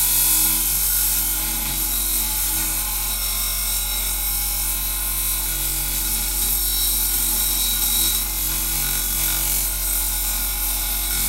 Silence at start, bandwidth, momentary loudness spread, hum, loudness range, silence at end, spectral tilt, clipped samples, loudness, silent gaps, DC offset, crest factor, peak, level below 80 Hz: 0 s; 16 kHz; 4 LU; none; 2 LU; 0 s; -0.5 dB/octave; under 0.1%; -19 LUFS; none; under 0.1%; 16 dB; -4 dBFS; -30 dBFS